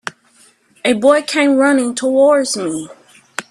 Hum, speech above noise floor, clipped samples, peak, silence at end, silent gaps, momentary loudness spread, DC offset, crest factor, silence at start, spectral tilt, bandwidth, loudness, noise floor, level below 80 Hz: none; 38 dB; under 0.1%; 0 dBFS; 0.1 s; none; 17 LU; under 0.1%; 16 dB; 0.05 s; -3 dB/octave; 12.5 kHz; -14 LUFS; -51 dBFS; -62 dBFS